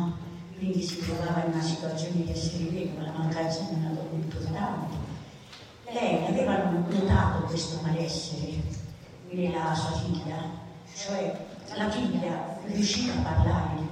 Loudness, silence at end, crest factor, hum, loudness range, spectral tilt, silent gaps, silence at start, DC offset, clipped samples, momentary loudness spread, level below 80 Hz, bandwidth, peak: -30 LUFS; 0 s; 18 dB; none; 4 LU; -6 dB/octave; none; 0 s; under 0.1%; under 0.1%; 13 LU; -44 dBFS; 10.5 kHz; -10 dBFS